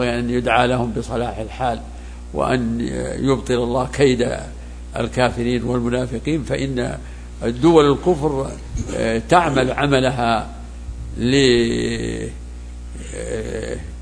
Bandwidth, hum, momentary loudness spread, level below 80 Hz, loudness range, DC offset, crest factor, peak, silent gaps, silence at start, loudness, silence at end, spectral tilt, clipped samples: 10.5 kHz; 60 Hz at -35 dBFS; 17 LU; -32 dBFS; 4 LU; under 0.1%; 20 dB; 0 dBFS; none; 0 s; -19 LUFS; 0 s; -5.5 dB/octave; under 0.1%